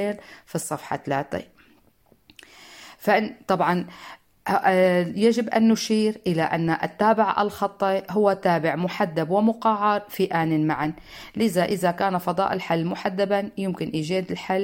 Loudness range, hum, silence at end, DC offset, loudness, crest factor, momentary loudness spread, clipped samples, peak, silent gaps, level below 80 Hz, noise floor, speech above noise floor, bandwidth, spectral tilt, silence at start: 6 LU; none; 0 s; under 0.1%; -23 LUFS; 18 dB; 10 LU; under 0.1%; -6 dBFS; none; -60 dBFS; -60 dBFS; 38 dB; 17 kHz; -6 dB/octave; 0 s